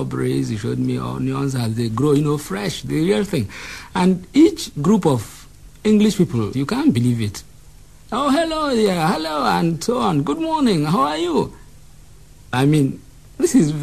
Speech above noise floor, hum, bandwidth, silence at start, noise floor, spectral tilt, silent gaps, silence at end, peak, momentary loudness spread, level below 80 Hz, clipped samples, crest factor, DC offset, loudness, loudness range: 27 dB; none; 13 kHz; 0 s; -45 dBFS; -6 dB/octave; none; 0 s; -4 dBFS; 8 LU; -46 dBFS; under 0.1%; 16 dB; 0.4%; -19 LUFS; 2 LU